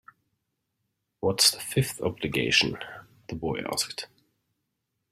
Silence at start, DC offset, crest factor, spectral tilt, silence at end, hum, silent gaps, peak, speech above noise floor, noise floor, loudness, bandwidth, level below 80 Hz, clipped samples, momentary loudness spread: 1.2 s; under 0.1%; 24 dB; -3 dB/octave; 1.05 s; none; none; -6 dBFS; 53 dB; -81 dBFS; -25 LUFS; 16 kHz; -58 dBFS; under 0.1%; 19 LU